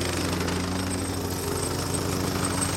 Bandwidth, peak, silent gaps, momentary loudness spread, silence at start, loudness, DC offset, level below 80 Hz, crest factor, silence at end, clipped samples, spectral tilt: 16.5 kHz; -14 dBFS; none; 2 LU; 0 s; -27 LUFS; under 0.1%; -46 dBFS; 14 dB; 0 s; under 0.1%; -4 dB/octave